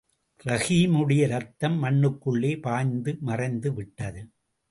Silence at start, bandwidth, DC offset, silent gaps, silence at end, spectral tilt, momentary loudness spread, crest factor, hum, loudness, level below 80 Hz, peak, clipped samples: 0.45 s; 11.5 kHz; under 0.1%; none; 0.45 s; -6.5 dB/octave; 14 LU; 16 dB; none; -25 LUFS; -56 dBFS; -10 dBFS; under 0.1%